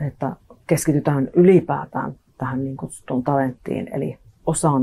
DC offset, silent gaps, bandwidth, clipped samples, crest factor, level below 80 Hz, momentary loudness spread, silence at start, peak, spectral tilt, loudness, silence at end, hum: under 0.1%; none; 13 kHz; under 0.1%; 18 dB; -52 dBFS; 15 LU; 0 s; -4 dBFS; -7 dB/octave; -21 LUFS; 0 s; none